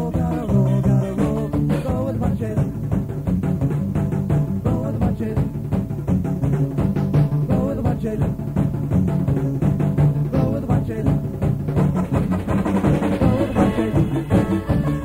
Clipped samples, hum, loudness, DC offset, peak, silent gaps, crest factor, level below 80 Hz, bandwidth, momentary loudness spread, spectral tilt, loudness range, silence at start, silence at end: under 0.1%; none; -21 LUFS; under 0.1%; -4 dBFS; none; 14 dB; -34 dBFS; 15.5 kHz; 4 LU; -9 dB/octave; 2 LU; 0 s; 0 s